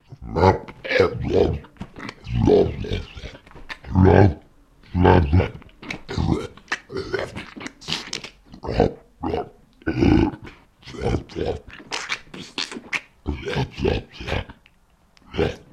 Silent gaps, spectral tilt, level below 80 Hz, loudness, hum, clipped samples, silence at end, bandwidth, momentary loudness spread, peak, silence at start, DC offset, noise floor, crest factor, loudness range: none; -6.5 dB/octave; -36 dBFS; -22 LUFS; none; under 0.1%; 0.15 s; 10 kHz; 19 LU; 0 dBFS; 0.1 s; under 0.1%; -58 dBFS; 22 dB; 8 LU